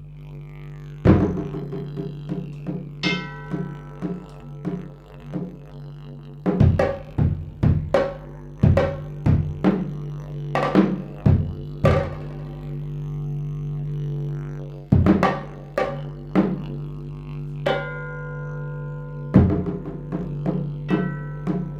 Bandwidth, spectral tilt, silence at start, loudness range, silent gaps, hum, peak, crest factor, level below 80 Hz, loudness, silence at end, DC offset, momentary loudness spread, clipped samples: 7.6 kHz; -8.5 dB/octave; 0 s; 7 LU; none; 50 Hz at -50 dBFS; -2 dBFS; 22 dB; -38 dBFS; -24 LUFS; 0 s; under 0.1%; 16 LU; under 0.1%